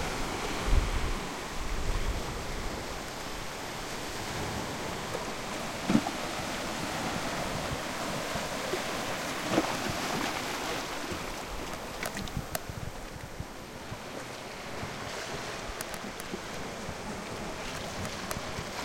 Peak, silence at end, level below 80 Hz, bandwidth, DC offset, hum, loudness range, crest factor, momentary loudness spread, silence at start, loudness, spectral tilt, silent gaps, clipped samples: -10 dBFS; 0 s; -40 dBFS; 16.5 kHz; under 0.1%; none; 6 LU; 24 dB; 9 LU; 0 s; -35 LUFS; -3.5 dB/octave; none; under 0.1%